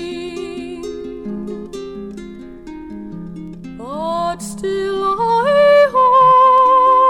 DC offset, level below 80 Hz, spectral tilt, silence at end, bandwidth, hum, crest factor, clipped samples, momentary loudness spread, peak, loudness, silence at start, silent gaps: under 0.1%; -46 dBFS; -5 dB/octave; 0 s; 13 kHz; none; 12 dB; under 0.1%; 22 LU; -2 dBFS; -13 LUFS; 0 s; none